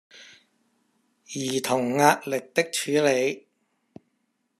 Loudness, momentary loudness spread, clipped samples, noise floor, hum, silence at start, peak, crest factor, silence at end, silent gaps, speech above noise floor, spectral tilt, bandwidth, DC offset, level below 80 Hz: -24 LUFS; 11 LU; under 0.1%; -74 dBFS; none; 0.15 s; -2 dBFS; 24 dB; 1.2 s; none; 50 dB; -3.5 dB/octave; 14 kHz; under 0.1%; -76 dBFS